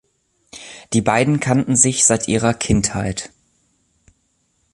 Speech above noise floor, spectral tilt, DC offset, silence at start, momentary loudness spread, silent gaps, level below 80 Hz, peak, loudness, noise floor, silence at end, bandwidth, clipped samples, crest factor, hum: 48 dB; -4 dB/octave; under 0.1%; 0.55 s; 22 LU; none; -40 dBFS; 0 dBFS; -16 LUFS; -65 dBFS; 1.45 s; 11.5 kHz; under 0.1%; 20 dB; none